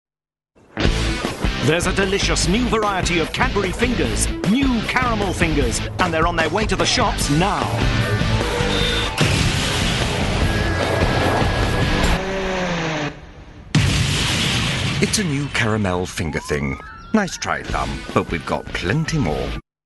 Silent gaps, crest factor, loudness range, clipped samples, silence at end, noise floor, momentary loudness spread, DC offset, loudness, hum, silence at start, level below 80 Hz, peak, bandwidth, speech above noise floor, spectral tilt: none; 18 dB; 3 LU; under 0.1%; 0.25 s; -78 dBFS; 5 LU; under 0.1%; -19 LUFS; none; 0.75 s; -28 dBFS; -2 dBFS; 12 kHz; 59 dB; -4.5 dB/octave